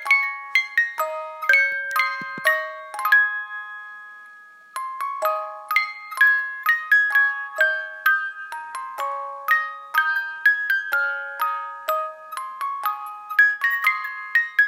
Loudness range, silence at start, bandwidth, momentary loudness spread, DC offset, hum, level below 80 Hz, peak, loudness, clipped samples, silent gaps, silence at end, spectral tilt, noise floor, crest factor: 4 LU; 0 s; 16.5 kHz; 15 LU; under 0.1%; none; under -90 dBFS; -4 dBFS; -21 LUFS; under 0.1%; none; 0 s; 0 dB/octave; -46 dBFS; 20 dB